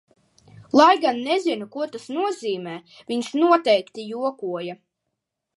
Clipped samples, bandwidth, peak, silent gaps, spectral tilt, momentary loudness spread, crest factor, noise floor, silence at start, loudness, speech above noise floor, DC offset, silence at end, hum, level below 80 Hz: under 0.1%; 11.5 kHz; -2 dBFS; none; -4.5 dB/octave; 15 LU; 22 dB; -80 dBFS; 0.75 s; -22 LUFS; 59 dB; under 0.1%; 0.8 s; none; -74 dBFS